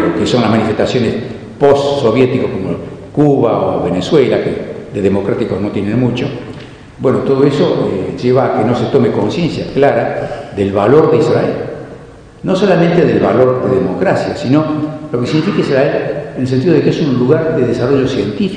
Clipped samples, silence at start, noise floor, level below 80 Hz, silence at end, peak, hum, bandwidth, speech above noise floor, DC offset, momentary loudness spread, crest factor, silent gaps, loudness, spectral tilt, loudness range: 0.3%; 0 s; -34 dBFS; -42 dBFS; 0 s; 0 dBFS; none; 10 kHz; 22 dB; under 0.1%; 10 LU; 12 dB; none; -13 LUFS; -7.5 dB/octave; 2 LU